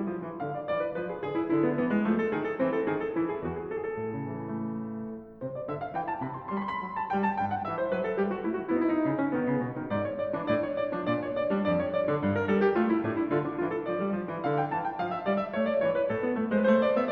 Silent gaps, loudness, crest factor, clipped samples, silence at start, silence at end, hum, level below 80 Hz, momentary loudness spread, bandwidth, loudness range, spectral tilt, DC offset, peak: none; -29 LUFS; 18 dB; under 0.1%; 0 s; 0 s; none; -62 dBFS; 8 LU; 6.2 kHz; 6 LU; -9.5 dB/octave; under 0.1%; -12 dBFS